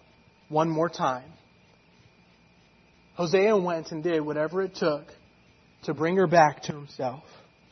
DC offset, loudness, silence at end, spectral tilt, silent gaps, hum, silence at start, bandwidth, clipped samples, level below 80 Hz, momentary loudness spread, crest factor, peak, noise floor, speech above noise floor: under 0.1%; -26 LUFS; 0.5 s; -6 dB/octave; none; none; 0.5 s; 6.4 kHz; under 0.1%; -68 dBFS; 16 LU; 22 dB; -6 dBFS; -59 dBFS; 34 dB